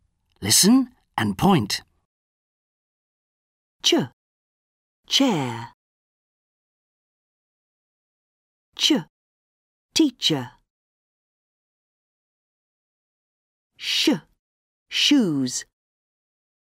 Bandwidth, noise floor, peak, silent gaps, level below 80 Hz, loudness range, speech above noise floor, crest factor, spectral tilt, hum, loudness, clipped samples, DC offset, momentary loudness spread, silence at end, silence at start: 16 kHz; under -90 dBFS; -4 dBFS; 2.05-3.79 s, 4.13-5.03 s, 5.74-8.72 s, 9.10-9.89 s, 10.70-13.70 s, 14.39-14.86 s; -60 dBFS; 5 LU; over 70 dB; 22 dB; -3 dB/octave; none; -21 LUFS; under 0.1%; under 0.1%; 13 LU; 1.05 s; 0.4 s